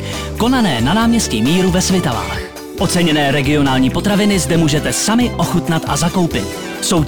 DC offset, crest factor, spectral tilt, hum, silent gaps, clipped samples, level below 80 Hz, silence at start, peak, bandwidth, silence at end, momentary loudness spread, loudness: under 0.1%; 8 dB; -4.5 dB/octave; none; none; under 0.1%; -32 dBFS; 0 s; -6 dBFS; over 20 kHz; 0 s; 7 LU; -15 LUFS